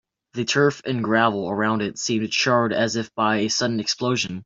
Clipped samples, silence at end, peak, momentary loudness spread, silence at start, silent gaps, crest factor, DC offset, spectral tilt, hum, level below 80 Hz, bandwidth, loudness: under 0.1%; 0 s; -4 dBFS; 5 LU; 0.35 s; none; 18 dB; under 0.1%; -4 dB/octave; none; -62 dBFS; 7.8 kHz; -22 LUFS